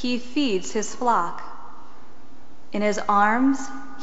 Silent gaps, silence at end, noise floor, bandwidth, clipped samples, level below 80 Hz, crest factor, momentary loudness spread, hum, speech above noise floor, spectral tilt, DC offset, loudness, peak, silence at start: none; 0 s; -50 dBFS; 8 kHz; under 0.1%; -58 dBFS; 18 dB; 17 LU; none; 27 dB; -3 dB/octave; 4%; -23 LUFS; -6 dBFS; 0 s